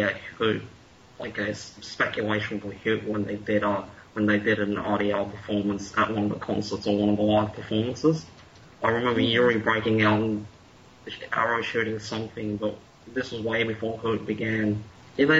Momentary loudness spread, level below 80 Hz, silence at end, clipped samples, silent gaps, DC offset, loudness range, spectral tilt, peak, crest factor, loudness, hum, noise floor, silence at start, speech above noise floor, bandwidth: 12 LU; -58 dBFS; 0 s; under 0.1%; none; under 0.1%; 5 LU; -6 dB/octave; -8 dBFS; 18 dB; -26 LUFS; none; -52 dBFS; 0 s; 26 dB; 8 kHz